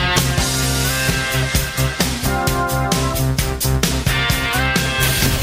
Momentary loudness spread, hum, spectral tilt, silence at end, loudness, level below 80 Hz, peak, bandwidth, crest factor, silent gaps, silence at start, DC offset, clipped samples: 3 LU; none; -3.5 dB/octave; 0 s; -17 LUFS; -26 dBFS; -2 dBFS; 16.5 kHz; 16 dB; none; 0 s; under 0.1%; under 0.1%